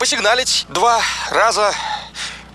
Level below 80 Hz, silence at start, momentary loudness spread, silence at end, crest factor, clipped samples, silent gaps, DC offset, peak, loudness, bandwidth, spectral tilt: -46 dBFS; 0 s; 11 LU; 0.05 s; 14 dB; under 0.1%; none; under 0.1%; -2 dBFS; -16 LUFS; 15 kHz; -0.5 dB/octave